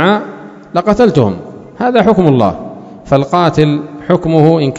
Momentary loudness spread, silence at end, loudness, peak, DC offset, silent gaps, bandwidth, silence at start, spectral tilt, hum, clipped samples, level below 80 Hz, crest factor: 18 LU; 0 s; -11 LUFS; 0 dBFS; under 0.1%; none; 8 kHz; 0 s; -7.5 dB/octave; none; 0.9%; -40 dBFS; 12 dB